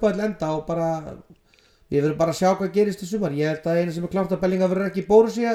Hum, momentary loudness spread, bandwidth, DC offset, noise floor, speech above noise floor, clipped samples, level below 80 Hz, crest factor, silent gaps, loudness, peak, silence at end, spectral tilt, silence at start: none; 9 LU; 14 kHz; under 0.1%; -58 dBFS; 36 dB; under 0.1%; -52 dBFS; 18 dB; none; -22 LUFS; -4 dBFS; 0 s; -7 dB/octave; 0 s